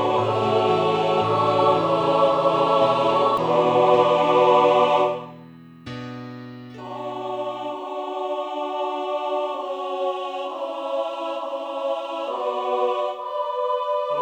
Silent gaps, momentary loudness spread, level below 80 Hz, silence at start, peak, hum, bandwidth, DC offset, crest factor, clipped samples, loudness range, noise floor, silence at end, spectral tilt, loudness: none; 15 LU; -64 dBFS; 0 s; -4 dBFS; none; 9.4 kHz; under 0.1%; 18 dB; under 0.1%; 11 LU; -44 dBFS; 0 s; -6 dB/octave; -22 LUFS